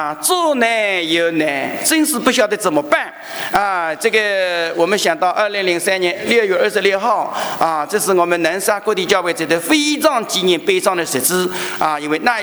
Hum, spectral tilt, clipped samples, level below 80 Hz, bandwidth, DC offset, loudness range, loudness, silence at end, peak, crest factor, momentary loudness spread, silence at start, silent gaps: none; -2.5 dB/octave; under 0.1%; -58 dBFS; over 20 kHz; under 0.1%; 1 LU; -16 LUFS; 0 s; 0 dBFS; 16 dB; 4 LU; 0 s; none